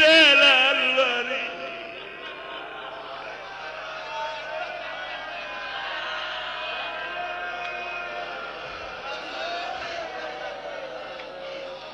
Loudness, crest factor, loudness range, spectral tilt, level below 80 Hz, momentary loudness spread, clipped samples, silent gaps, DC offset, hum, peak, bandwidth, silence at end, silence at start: -24 LUFS; 20 dB; 10 LU; -1.5 dB/octave; -62 dBFS; 17 LU; under 0.1%; none; under 0.1%; none; -8 dBFS; 11.5 kHz; 0 s; 0 s